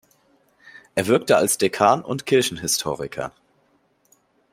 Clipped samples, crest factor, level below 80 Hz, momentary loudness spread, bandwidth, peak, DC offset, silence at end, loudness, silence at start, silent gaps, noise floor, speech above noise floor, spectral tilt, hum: under 0.1%; 20 dB; -60 dBFS; 12 LU; 16 kHz; -2 dBFS; under 0.1%; 1.25 s; -21 LUFS; 0.75 s; none; -63 dBFS; 43 dB; -3.5 dB/octave; none